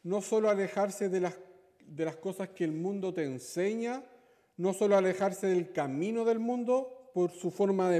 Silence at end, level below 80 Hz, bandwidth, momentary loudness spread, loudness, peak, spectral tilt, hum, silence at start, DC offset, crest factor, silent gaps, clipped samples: 0 s; -82 dBFS; 15 kHz; 10 LU; -32 LUFS; -14 dBFS; -6 dB/octave; none; 0.05 s; under 0.1%; 16 dB; none; under 0.1%